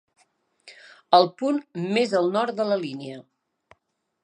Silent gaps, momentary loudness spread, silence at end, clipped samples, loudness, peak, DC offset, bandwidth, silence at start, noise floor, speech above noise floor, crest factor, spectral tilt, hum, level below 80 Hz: none; 17 LU; 1.05 s; under 0.1%; -23 LUFS; -2 dBFS; under 0.1%; 10 kHz; 0.65 s; -73 dBFS; 51 dB; 22 dB; -5.5 dB/octave; none; -80 dBFS